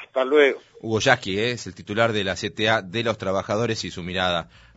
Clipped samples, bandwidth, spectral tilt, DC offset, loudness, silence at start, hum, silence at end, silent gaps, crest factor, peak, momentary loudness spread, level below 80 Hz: under 0.1%; 8 kHz; -3 dB/octave; under 0.1%; -23 LUFS; 0 s; none; 0.3 s; none; 22 dB; -2 dBFS; 10 LU; -56 dBFS